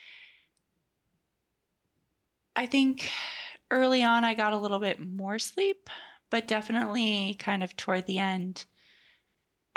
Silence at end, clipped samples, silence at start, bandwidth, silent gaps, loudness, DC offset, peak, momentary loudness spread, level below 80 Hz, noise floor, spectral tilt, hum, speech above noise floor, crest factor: 1.15 s; under 0.1%; 0.05 s; 12.5 kHz; none; -29 LUFS; under 0.1%; -14 dBFS; 12 LU; -76 dBFS; -81 dBFS; -4.5 dB/octave; none; 52 dB; 18 dB